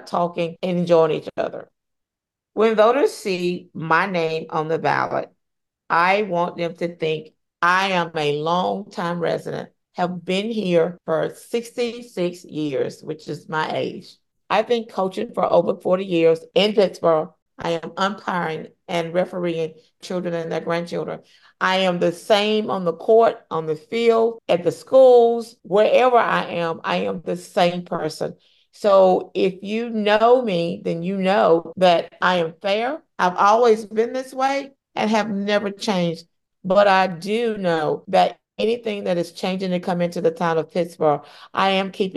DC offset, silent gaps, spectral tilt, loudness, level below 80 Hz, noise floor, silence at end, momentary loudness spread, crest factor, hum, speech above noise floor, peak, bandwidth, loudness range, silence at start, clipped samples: under 0.1%; 17.42-17.46 s; -5.5 dB/octave; -20 LUFS; -66 dBFS; -86 dBFS; 0 s; 11 LU; 16 dB; none; 66 dB; -4 dBFS; 12.5 kHz; 7 LU; 0.05 s; under 0.1%